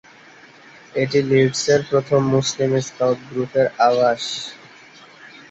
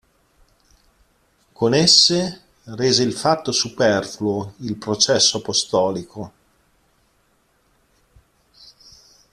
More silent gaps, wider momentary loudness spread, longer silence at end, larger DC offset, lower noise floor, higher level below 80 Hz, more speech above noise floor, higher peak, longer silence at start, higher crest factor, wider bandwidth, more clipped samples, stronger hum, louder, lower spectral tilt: neither; second, 8 LU vs 18 LU; second, 0.25 s vs 3.05 s; neither; second, -46 dBFS vs -62 dBFS; about the same, -60 dBFS vs -58 dBFS; second, 28 dB vs 44 dB; second, -4 dBFS vs 0 dBFS; second, 0.95 s vs 1.6 s; second, 16 dB vs 22 dB; second, 8.2 kHz vs 14 kHz; neither; neither; about the same, -19 LUFS vs -18 LUFS; first, -5 dB/octave vs -3 dB/octave